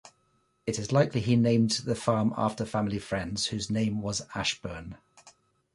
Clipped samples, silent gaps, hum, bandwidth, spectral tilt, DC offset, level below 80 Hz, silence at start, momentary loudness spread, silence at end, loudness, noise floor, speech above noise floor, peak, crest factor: under 0.1%; none; none; 11.5 kHz; -5 dB/octave; under 0.1%; -54 dBFS; 0.05 s; 11 LU; 0.45 s; -28 LUFS; -71 dBFS; 43 dB; -10 dBFS; 18 dB